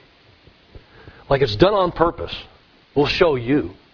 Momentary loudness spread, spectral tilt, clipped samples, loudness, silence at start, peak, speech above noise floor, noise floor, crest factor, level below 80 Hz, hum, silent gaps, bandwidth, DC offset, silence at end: 13 LU; -7 dB/octave; under 0.1%; -19 LUFS; 0.75 s; 0 dBFS; 33 dB; -51 dBFS; 20 dB; -40 dBFS; none; none; 5.4 kHz; under 0.1%; 0.2 s